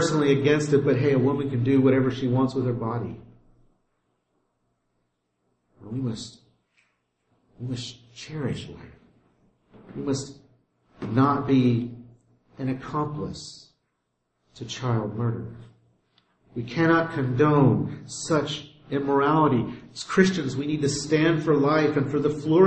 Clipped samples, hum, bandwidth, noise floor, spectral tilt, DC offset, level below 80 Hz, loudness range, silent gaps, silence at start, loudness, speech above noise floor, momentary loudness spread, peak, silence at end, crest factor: under 0.1%; none; 8.8 kHz; -76 dBFS; -6.5 dB/octave; under 0.1%; -56 dBFS; 15 LU; none; 0 s; -24 LUFS; 53 dB; 17 LU; -6 dBFS; 0 s; 20 dB